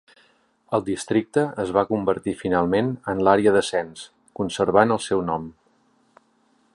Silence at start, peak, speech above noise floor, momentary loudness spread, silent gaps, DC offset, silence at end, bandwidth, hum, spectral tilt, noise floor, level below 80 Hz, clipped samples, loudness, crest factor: 0.7 s; -2 dBFS; 42 dB; 12 LU; none; under 0.1%; 1.25 s; 11.5 kHz; none; -5.5 dB/octave; -63 dBFS; -54 dBFS; under 0.1%; -22 LUFS; 22 dB